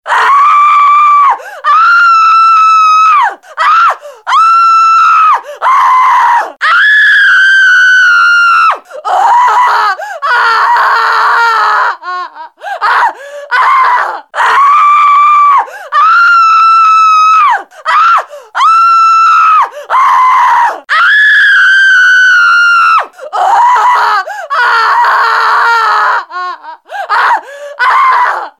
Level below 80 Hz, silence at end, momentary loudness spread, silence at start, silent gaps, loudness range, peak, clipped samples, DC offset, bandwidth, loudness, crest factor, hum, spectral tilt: -70 dBFS; 0.1 s; 10 LU; 0.05 s; none; 5 LU; 0 dBFS; under 0.1%; under 0.1%; 13 kHz; -6 LUFS; 6 dB; none; 2 dB/octave